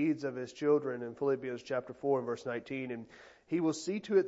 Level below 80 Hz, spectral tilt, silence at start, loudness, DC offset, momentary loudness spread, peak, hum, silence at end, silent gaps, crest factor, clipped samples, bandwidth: -78 dBFS; -6 dB/octave; 0 s; -35 LUFS; under 0.1%; 9 LU; -16 dBFS; none; 0 s; none; 18 dB; under 0.1%; 8 kHz